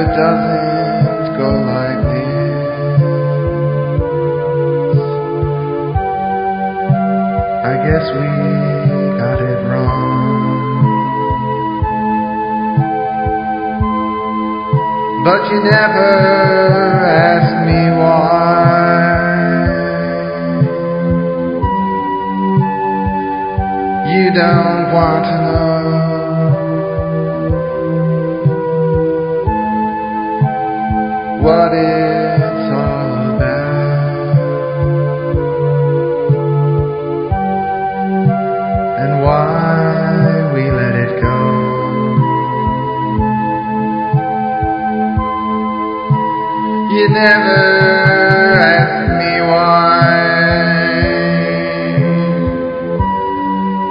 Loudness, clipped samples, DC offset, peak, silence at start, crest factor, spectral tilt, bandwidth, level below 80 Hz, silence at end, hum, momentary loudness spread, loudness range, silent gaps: -14 LUFS; under 0.1%; 0.2%; 0 dBFS; 0 s; 14 dB; -10 dB/octave; 5.4 kHz; -30 dBFS; 0 s; none; 7 LU; 6 LU; none